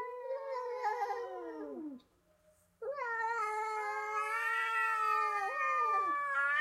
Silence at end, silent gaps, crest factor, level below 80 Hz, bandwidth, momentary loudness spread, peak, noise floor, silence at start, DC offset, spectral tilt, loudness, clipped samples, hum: 0 s; none; 14 dB; -82 dBFS; 15.5 kHz; 13 LU; -22 dBFS; -70 dBFS; 0 s; under 0.1%; -2 dB/octave; -35 LUFS; under 0.1%; none